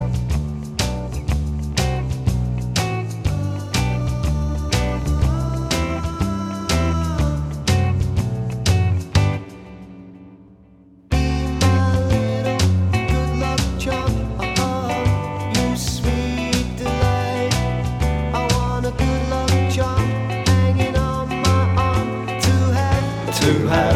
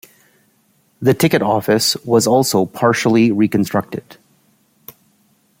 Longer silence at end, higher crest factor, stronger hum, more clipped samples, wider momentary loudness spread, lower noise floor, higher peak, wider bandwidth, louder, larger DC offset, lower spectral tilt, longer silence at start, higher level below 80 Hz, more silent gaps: second, 0 s vs 1.45 s; about the same, 16 dB vs 16 dB; neither; neither; about the same, 6 LU vs 6 LU; second, -48 dBFS vs -59 dBFS; about the same, -2 dBFS vs -2 dBFS; about the same, 15.5 kHz vs 16.5 kHz; second, -20 LUFS vs -15 LUFS; neither; about the same, -5.5 dB/octave vs -5 dB/octave; second, 0 s vs 1 s; first, -28 dBFS vs -58 dBFS; neither